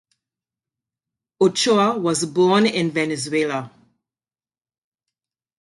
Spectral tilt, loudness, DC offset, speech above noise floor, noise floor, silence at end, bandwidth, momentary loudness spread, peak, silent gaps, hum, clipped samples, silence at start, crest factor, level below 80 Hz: -4.5 dB/octave; -19 LUFS; under 0.1%; over 71 dB; under -90 dBFS; 1.9 s; 11.5 kHz; 6 LU; -6 dBFS; none; none; under 0.1%; 1.4 s; 18 dB; -66 dBFS